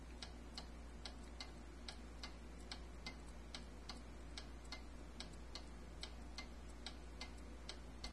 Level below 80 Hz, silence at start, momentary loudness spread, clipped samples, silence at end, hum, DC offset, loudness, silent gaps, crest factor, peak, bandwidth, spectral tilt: -56 dBFS; 0 s; 1 LU; under 0.1%; 0 s; none; under 0.1%; -54 LUFS; none; 22 dB; -32 dBFS; 12 kHz; -4 dB/octave